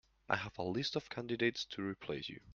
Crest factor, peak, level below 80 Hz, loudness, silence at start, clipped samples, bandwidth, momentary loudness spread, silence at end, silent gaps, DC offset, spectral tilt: 26 dB; -14 dBFS; -70 dBFS; -39 LUFS; 0.3 s; under 0.1%; 7.4 kHz; 7 LU; 0 s; none; under 0.1%; -5 dB/octave